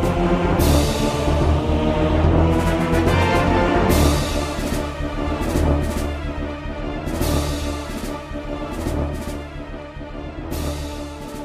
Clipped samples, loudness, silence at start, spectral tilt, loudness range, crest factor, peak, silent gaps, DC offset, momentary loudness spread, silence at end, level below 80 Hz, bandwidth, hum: under 0.1%; -21 LUFS; 0 s; -6 dB/octave; 10 LU; 16 dB; -4 dBFS; none; under 0.1%; 13 LU; 0 s; -26 dBFS; 15 kHz; none